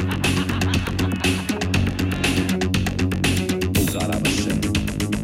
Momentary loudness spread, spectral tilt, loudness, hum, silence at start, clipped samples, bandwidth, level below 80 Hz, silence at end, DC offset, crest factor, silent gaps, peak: 2 LU; -5 dB/octave; -21 LUFS; none; 0 s; under 0.1%; 16.5 kHz; -34 dBFS; 0 s; under 0.1%; 12 dB; none; -8 dBFS